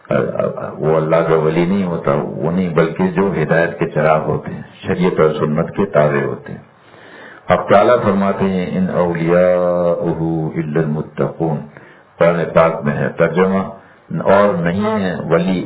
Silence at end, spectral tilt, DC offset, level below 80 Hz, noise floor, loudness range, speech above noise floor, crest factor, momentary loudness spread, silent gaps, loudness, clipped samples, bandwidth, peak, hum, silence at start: 0 s; -11.5 dB/octave; under 0.1%; -44 dBFS; -41 dBFS; 3 LU; 26 dB; 16 dB; 9 LU; none; -16 LUFS; under 0.1%; 4 kHz; 0 dBFS; none; 0.1 s